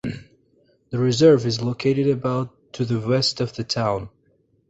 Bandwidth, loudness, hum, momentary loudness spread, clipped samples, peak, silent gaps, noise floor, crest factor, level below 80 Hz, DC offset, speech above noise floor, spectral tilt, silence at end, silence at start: 8.2 kHz; -21 LUFS; none; 16 LU; under 0.1%; -4 dBFS; none; -63 dBFS; 18 dB; -54 dBFS; under 0.1%; 43 dB; -6 dB/octave; 0.6 s; 0.05 s